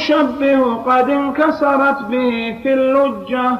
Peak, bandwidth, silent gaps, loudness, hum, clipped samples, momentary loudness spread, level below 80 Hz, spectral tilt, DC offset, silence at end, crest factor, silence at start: -2 dBFS; 7 kHz; none; -15 LUFS; none; under 0.1%; 4 LU; -52 dBFS; -6 dB/octave; under 0.1%; 0 s; 12 dB; 0 s